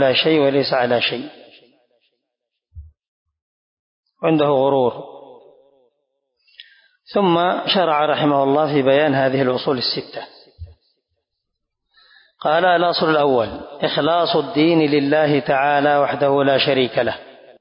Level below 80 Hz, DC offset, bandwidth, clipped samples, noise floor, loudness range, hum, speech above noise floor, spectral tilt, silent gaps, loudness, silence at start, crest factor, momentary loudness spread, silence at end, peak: -54 dBFS; under 0.1%; 5.4 kHz; under 0.1%; -79 dBFS; 7 LU; none; 63 dB; -10 dB/octave; 3.08-3.26 s, 3.42-4.03 s; -17 LUFS; 0 s; 14 dB; 9 LU; 0.35 s; -4 dBFS